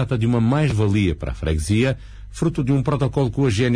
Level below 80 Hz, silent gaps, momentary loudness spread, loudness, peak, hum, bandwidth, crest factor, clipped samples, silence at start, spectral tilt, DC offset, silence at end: -34 dBFS; none; 6 LU; -20 LUFS; -8 dBFS; none; 11 kHz; 12 dB; under 0.1%; 0 s; -7 dB/octave; under 0.1%; 0 s